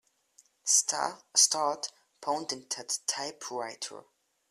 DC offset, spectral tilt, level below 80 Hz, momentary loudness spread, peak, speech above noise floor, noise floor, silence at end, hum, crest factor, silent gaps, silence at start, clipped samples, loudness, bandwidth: under 0.1%; 0.5 dB/octave; -82 dBFS; 16 LU; -8 dBFS; 34 dB; -65 dBFS; 0.5 s; none; 24 dB; none; 0.65 s; under 0.1%; -29 LUFS; 15 kHz